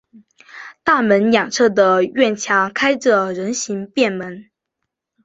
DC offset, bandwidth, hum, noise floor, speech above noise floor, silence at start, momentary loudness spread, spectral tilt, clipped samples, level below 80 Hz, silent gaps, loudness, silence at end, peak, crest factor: under 0.1%; 8 kHz; none; -79 dBFS; 62 dB; 0.15 s; 10 LU; -4 dB/octave; under 0.1%; -62 dBFS; none; -16 LUFS; 0.85 s; -2 dBFS; 16 dB